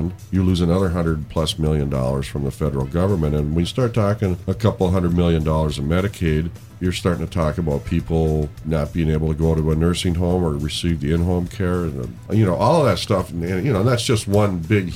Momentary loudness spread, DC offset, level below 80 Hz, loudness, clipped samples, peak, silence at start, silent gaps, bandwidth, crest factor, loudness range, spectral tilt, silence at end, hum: 5 LU; 0.2%; -32 dBFS; -20 LUFS; under 0.1%; -4 dBFS; 0 s; none; 16 kHz; 16 dB; 2 LU; -6.5 dB/octave; 0 s; none